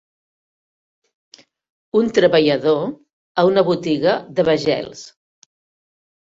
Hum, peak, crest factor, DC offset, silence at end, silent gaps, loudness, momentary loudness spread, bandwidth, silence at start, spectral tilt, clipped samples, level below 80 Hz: none; -2 dBFS; 18 dB; under 0.1%; 1.25 s; 3.13-3.35 s; -17 LUFS; 11 LU; 7.8 kHz; 1.95 s; -6 dB/octave; under 0.1%; -60 dBFS